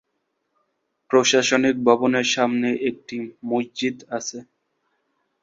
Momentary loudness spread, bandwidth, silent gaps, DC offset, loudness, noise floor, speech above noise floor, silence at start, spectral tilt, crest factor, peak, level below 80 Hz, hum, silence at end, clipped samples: 15 LU; 7.8 kHz; none; under 0.1%; -21 LUFS; -75 dBFS; 54 dB; 1.1 s; -3 dB/octave; 20 dB; -2 dBFS; -66 dBFS; none; 1 s; under 0.1%